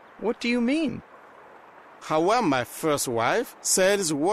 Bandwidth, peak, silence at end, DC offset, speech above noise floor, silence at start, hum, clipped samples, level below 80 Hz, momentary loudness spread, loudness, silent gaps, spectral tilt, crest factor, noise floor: 15.5 kHz; -8 dBFS; 0 s; under 0.1%; 25 dB; 0.2 s; none; under 0.1%; -60 dBFS; 9 LU; -24 LUFS; none; -3.5 dB/octave; 16 dB; -49 dBFS